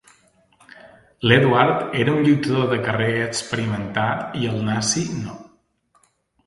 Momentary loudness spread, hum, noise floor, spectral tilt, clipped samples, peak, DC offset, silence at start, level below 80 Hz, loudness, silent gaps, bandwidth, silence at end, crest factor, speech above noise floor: 9 LU; none; -62 dBFS; -5 dB/octave; under 0.1%; 0 dBFS; under 0.1%; 0.85 s; -54 dBFS; -20 LUFS; none; 11.5 kHz; 1.05 s; 20 dB; 43 dB